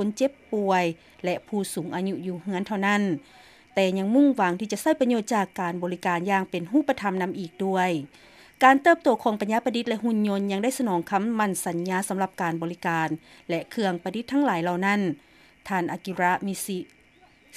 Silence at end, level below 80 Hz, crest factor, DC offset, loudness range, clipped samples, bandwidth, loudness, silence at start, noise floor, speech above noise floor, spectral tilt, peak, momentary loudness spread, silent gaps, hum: 0 s; -68 dBFS; 22 dB; under 0.1%; 4 LU; under 0.1%; 15.5 kHz; -25 LUFS; 0 s; -57 dBFS; 32 dB; -5.5 dB/octave; -4 dBFS; 10 LU; none; none